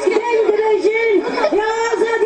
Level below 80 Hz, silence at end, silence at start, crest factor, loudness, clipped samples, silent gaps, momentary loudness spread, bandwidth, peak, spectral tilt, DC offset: -54 dBFS; 0 s; 0 s; 14 dB; -16 LUFS; under 0.1%; none; 2 LU; 9.2 kHz; -2 dBFS; -3.5 dB/octave; under 0.1%